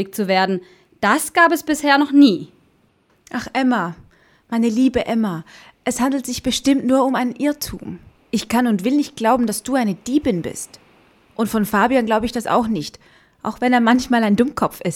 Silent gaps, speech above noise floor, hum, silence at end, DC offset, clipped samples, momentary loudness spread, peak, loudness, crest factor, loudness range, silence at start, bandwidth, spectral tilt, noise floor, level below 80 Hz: none; 41 dB; none; 0 s; under 0.1%; under 0.1%; 14 LU; -2 dBFS; -18 LUFS; 18 dB; 4 LU; 0 s; 17.5 kHz; -4.5 dB/octave; -59 dBFS; -48 dBFS